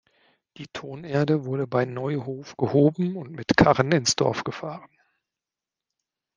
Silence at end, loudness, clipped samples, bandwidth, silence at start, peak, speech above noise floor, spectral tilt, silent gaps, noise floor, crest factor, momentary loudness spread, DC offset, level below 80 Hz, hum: 1.5 s; -23 LUFS; under 0.1%; 10 kHz; 0.6 s; -2 dBFS; 66 dB; -5 dB/octave; none; -89 dBFS; 24 dB; 18 LU; under 0.1%; -54 dBFS; none